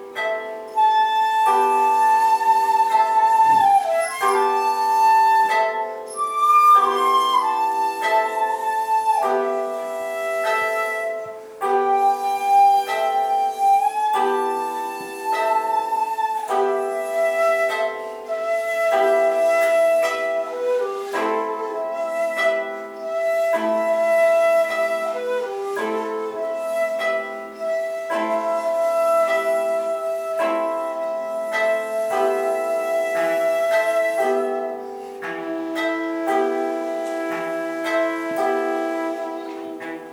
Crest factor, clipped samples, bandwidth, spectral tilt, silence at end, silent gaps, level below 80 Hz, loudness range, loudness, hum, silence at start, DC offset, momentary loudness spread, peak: 14 dB; under 0.1%; 19 kHz; -2.5 dB/octave; 0 s; none; -72 dBFS; 7 LU; -20 LUFS; none; 0 s; under 0.1%; 10 LU; -6 dBFS